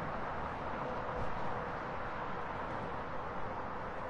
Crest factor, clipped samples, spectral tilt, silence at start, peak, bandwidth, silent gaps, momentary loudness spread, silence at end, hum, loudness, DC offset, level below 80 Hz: 14 dB; under 0.1%; -7 dB/octave; 0 s; -24 dBFS; 10.5 kHz; none; 2 LU; 0 s; none; -40 LUFS; under 0.1%; -52 dBFS